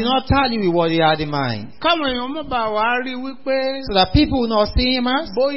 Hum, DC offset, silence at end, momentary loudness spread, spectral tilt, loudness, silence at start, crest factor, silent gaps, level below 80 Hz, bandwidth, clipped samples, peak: none; 2%; 0 s; 7 LU; -9.5 dB/octave; -18 LUFS; 0 s; 18 dB; none; -32 dBFS; 5.8 kHz; under 0.1%; 0 dBFS